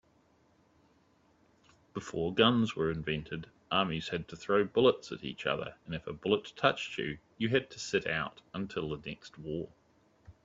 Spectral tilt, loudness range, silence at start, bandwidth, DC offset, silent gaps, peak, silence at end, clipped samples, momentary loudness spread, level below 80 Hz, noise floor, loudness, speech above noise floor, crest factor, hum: -5.5 dB/octave; 4 LU; 1.95 s; 7.8 kHz; under 0.1%; none; -10 dBFS; 0.15 s; under 0.1%; 14 LU; -62 dBFS; -68 dBFS; -33 LUFS; 35 dB; 24 dB; none